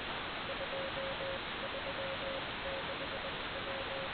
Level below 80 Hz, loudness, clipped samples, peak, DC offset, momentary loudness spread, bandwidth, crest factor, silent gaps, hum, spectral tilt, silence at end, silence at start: -58 dBFS; -39 LUFS; under 0.1%; -26 dBFS; under 0.1%; 1 LU; 4.8 kHz; 14 dB; none; none; -1 dB/octave; 0 s; 0 s